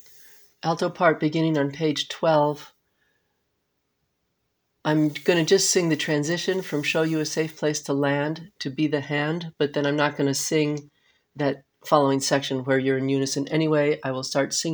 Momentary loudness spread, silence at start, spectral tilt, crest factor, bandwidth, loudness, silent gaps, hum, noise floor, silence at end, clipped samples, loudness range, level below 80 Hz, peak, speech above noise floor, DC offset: 7 LU; 0.65 s; -4.5 dB/octave; 22 dB; over 20 kHz; -24 LUFS; none; none; -75 dBFS; 0 s; under 0.1%; 4 LU; -70 dBFS; -4 dBFS; 52 dB; under 0.1%